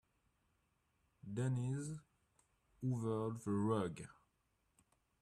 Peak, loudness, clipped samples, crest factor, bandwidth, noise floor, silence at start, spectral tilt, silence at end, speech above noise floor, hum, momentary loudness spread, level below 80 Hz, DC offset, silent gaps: -24 dBFS; -41 LUFS; under 0.1%; 20 dB; 12.5 kHz; -82 dBFS; 1.25 s; -7.5 dB/octave; 1.1 s; 42 dB; none; 16 LU; -74 dBFS; under 0.1%; none